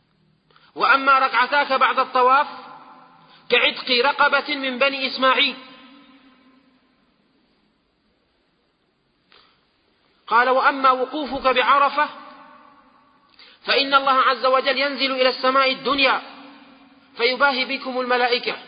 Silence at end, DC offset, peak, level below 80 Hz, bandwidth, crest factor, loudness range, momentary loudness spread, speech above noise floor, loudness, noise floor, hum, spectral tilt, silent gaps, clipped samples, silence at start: 0 s; under 0.1%; -4 dBFS; -62 dBFS; 5.2 kHz; 18 dB; 5 LU; 7 LU; 47 dB; -18 LUFS; -66 dBFS; none; -6.5 dB/octave; none; under 0.1%; 0.75 s